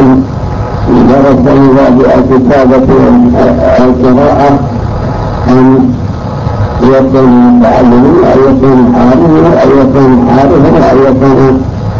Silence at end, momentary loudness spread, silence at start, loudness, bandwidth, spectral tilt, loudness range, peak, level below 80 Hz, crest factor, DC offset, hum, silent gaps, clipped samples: 0 s; 9 LU; 0 s; -5 LUFS; 7.2 kHz; -9 dB/octave; 3 LU; 0 dBFS; -20 dBFS; 4 dB; under 0.1%; none; none; 5%